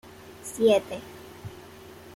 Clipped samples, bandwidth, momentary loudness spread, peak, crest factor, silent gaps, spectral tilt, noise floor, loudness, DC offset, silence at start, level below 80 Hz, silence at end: under 0.1%; 16.5 kHz; 24 LU; -10 dBFS; 20 dB; none; -4.5 dB/octave; -46 dBFS; -23 LUFS; under 0.1%; 0.05 s; -62 dBFS; 0.05 s